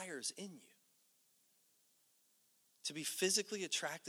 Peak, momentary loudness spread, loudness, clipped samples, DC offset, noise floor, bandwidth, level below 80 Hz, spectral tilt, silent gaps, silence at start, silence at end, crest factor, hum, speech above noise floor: -20 dBFS; 14 LU; -39 LUFS; under 0.1%; under 0.1%; -75 dBFS; over 20 kHz; under -90 dBFS; -1.5 dB/octave; none; 0 s; 0 s; 24 dB; none; 34 dB